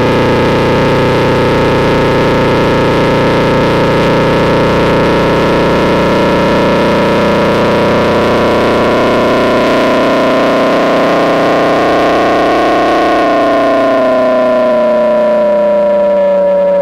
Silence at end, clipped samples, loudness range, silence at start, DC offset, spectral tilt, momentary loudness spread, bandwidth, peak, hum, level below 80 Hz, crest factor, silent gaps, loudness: 0 s; under 0.1%; 0 LU; 0 s; under 0.1%; -6.5 dB/octave; 0 LU; 16 kHz; -2 dBFS; none; -30 dBFS; 6 dB; none; -9 LUFS